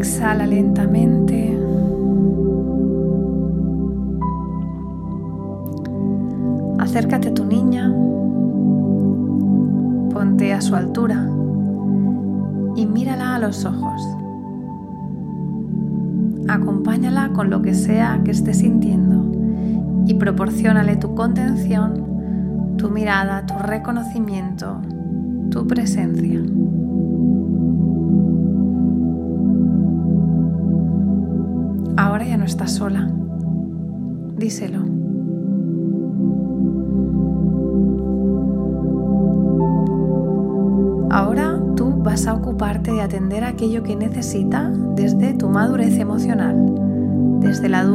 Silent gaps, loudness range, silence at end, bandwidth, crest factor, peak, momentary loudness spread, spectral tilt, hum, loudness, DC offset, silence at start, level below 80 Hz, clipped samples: none; 5 LU; 0 s; 13.5 kHz; 18 dB; 0 dBFS; 7 LU; -7.5 dB/octave; none; -19 LUFS; under 0.1%; 0 s; -36 dBFS; under 0.1%